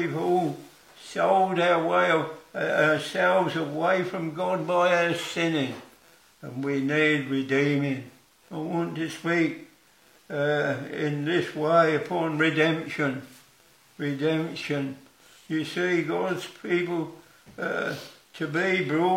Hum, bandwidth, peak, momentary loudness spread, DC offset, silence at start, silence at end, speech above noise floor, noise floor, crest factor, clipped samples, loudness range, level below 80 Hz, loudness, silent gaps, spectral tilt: none; 16.5 kHz; -8 dBFS; 13 LU; under 0.1%; 0 s; 0 s; 33 dB; -59 dBFS; 18 dB; under 0.1%; 5 LU; -76 dBFS; -26 LUFS; none; -6 dB/octave